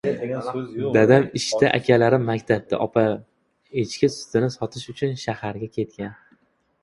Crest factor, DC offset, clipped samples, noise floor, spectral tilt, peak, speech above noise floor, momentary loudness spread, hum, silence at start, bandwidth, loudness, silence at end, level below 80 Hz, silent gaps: 22 dB; under 0.1%; under 0.1%; -62 dBFS; -6 dB/octave; 0 dBFS; 41 dB; 13 LU; none; 0.05 s; 11.5 kHz; -22 LUFS; 0.7 s; -56 dBFS; none